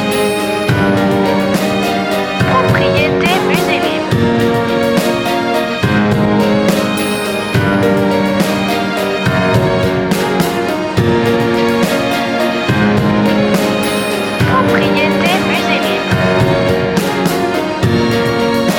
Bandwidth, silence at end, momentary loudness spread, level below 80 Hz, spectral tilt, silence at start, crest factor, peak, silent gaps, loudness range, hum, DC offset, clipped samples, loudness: 19.5 kHz; 0 s; 3 LU; -38 dBFS; -5.5 dB/octave; 0 s; 12 dB; 0 dBFS; none; 1 LU; none; under 0.1%; under 0.1%; -13 LUFS